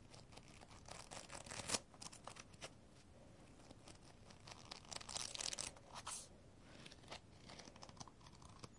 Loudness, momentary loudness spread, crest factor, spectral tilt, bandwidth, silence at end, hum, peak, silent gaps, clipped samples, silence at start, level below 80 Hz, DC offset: -51 LUFS; 19 LU; 30 dB; -1.5 dB/octave; 12 kHz; 0 s; none; -24 dBFS; none; under 0.1%; 0 s; -70 dBFS; under 0.1%